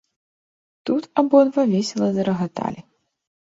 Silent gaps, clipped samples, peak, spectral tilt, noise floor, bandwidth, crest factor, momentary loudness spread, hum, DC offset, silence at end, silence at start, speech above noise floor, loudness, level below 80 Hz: none; under 0.1%; -2 dBFS; -6.5 dB/octave; under -90 dBFS; 8 kHz; 20 dB; 14 LU; none; under 0.1%; 0.7 s; 0.85 s; over 71 dB; -20 LUFS; -64 dBFS